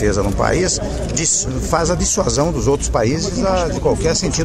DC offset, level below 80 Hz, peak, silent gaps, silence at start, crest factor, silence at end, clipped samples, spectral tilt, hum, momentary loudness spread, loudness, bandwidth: under 0.1%; -26 dBFS; 0 dBFS; none; 0 s; 16 dB; 0 s; under 0.1%; -4 dB/octave; none; 2 LU; -17 LUFS; 15.5 kHz